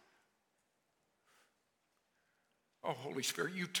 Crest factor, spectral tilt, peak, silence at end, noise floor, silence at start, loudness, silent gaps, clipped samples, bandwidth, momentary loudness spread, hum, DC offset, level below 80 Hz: 24 dB; -2.5 dB/octave; -22 dBFS; 0 s; -81 dBFS; 2.85 s; -40 LUFS; none; under 0.1%; 17.5 kHz; 6 LU; none; under 0.1%; under -90 dBFS